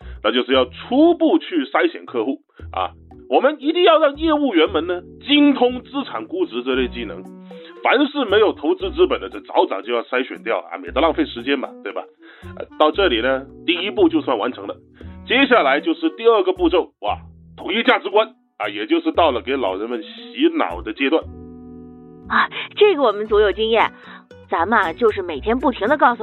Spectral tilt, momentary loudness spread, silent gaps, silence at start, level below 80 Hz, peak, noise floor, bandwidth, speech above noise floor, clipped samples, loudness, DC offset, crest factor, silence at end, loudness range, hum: -7 dB/octave; 15 LU; none; 0 s; -44 dBFS; 0 dBFS; -40 dBFS; 4.2 kHz; 21 dB; under 0.1%; -18 LUFS; under 0.1%; 18 dB; 0 s; 4 LU; none